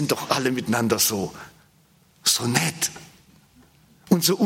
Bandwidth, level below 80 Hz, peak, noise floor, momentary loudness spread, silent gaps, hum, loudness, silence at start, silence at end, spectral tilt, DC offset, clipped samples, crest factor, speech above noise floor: 16.5 kHz; -62 dBFS; -2 dBFS; -58 dBFS; 11 LU; none; none; -22 LUFS; 0 s; 0 s; -3.5 dB/octave; under 0.1%; under 0.1%; 24 dB; 35 dB